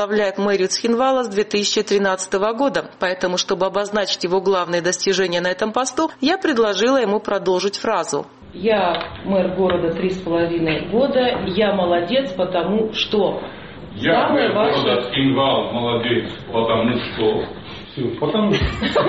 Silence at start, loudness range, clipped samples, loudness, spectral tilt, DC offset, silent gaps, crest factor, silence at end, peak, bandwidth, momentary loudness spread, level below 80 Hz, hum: 0 s; 2 LU; under 0.1%; -19 LUFS; -4.5 dB/octave; 0.2%; none; 14 dB; 0 s; -4 dBFS; 8.8 kHz; 6 LU; -44 dBFS; none